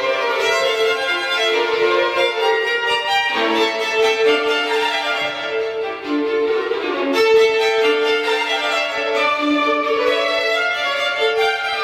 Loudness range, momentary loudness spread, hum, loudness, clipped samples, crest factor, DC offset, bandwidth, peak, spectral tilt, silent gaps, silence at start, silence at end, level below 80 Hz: 2 LU; 5 LU; none; -17 LUFS; under 0.1%; 14 dB; under 0.1%; 15 kHz; -4 dBFS; -1.5 dB/octave; none; 0 s; 0 s; -60 dBFS